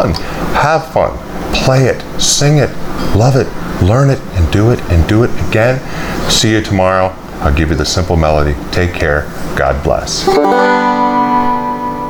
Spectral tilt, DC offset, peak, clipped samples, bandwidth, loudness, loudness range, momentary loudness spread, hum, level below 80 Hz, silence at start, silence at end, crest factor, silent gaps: -5 dB/octave; under 0.1%; 0 dBFS; under 0.1%; over 20 kHz; -12 LUFS; 1 LU; 7 LU; none; -24 dBFS; 0 s; 0 s; 12 dB; none